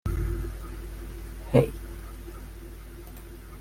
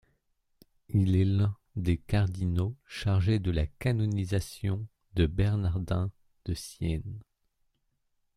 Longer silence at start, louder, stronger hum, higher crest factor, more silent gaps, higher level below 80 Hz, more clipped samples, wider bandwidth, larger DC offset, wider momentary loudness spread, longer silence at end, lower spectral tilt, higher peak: second, 0.05 s vs 0.9 s; about the same, -30 LUFS vs -30 LUFS; neither; first, 24 dB vs 16 dB; neither; first, -36 dBFS vs -44 dBFS; neither; first, 16.5 kHz vs 13 kHz; neither; first, 20 LU vs 10 LU; second, 0 s vs 1.15 s; about the same, -7.5 dB/octave vs -7.5 dB/octave; first, -6 dBFS vs -12 dBFS